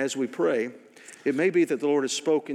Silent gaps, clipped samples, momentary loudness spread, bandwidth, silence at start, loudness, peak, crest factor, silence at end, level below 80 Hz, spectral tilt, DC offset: none; under 0.1%; 7 LU; 14 kHz; 0 s; -26 LUFS; -12 dBFS; 12 dB; 0 s; under -90 dBFS; -4 dB/octave; under 0.1%